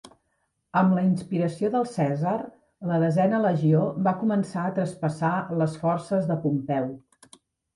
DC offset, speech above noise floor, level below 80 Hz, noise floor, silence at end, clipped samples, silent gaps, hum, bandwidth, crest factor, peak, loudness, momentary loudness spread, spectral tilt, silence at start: under 0.1%; 50 dB; -66 dBFS; -74 dBFS; 0.75 s; under 0.1%; none; none; 11.5 kHz; 16 dB; -10 dBFS; -25 LUFS; 7 LU; -8.5 dB/octave; 0.05 s